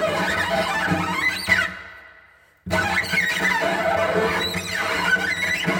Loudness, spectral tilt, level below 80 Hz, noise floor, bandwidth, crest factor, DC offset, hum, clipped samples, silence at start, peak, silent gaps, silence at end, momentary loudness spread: -21 LUFS; -3.5 dB/octave; -48 dBFS; -53 dBFS; 17 kHz; 18 dB; under 0.1%; none; under 0.1%; 0 s; -4 dBFS; none; 0 s; 5 LU